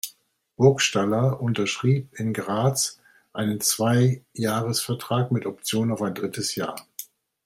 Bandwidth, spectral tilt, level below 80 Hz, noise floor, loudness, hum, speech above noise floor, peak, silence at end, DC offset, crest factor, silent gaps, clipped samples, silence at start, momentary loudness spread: 16 kHz; -4.5 dB/octave; -64 dBFS; -55 dBFS; -24 LUFS; none; 31 dB; -4 dBFS; 0.4 s; under 0.1%; 20 dB; none; under 0.1%; 0.05 s; 11 LU